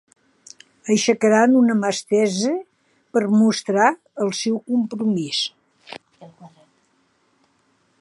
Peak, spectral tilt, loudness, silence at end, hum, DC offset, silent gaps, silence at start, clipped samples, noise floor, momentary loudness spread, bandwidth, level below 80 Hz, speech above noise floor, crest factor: -2 dBFS; -4.5 dB/octave; -19 LUFS; 1.55 s; none; under 0.1%; none; 0.85 s; under 0.1%; -64 dBFS; 13 LU; 11.5 kHz; -74 dBFS; 45 dB; 18 dB